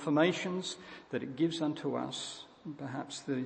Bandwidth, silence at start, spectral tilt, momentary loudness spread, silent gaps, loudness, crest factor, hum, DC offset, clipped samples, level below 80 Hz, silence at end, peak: 8.8 kHz; 0 s; -5 dB/octave; 15 LU; none; -35 LUFS; 22 dB; none; under 0.1%; under 0.1%; -76 dBFS; 0 s; -14 dBFS